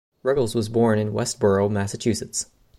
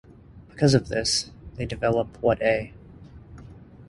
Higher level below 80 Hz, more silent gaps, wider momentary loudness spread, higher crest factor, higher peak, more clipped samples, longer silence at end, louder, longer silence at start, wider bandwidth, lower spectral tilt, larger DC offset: second, -54 dBFS vs -46 dBFS; neither; second, 6 LU vs 25 LU; second, 14 dB vs 20 dB; about the same, -8 dBFS vs -6 dBFS; neither; first, 0.35 s vs 0.05 s; about the same, -23 LUFS vs -24 LUFS; about the same, 0.25 s vs 0.35 s; first, 15.5 kHz vs 11.5 kHz; about the same, -5.5 dB/octave vs -4.5 dB/octave; neither